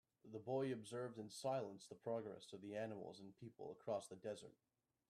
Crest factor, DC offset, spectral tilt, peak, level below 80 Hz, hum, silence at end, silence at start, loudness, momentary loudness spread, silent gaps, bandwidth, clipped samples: 16 dB; under 0.1%; -5.5 dB/octave; -34 dBFS; -90 dBFS; none; 0.6 s; 0.25 s; -49 LUFS; 12 LU; none; 13.5 kHz; under 0.1%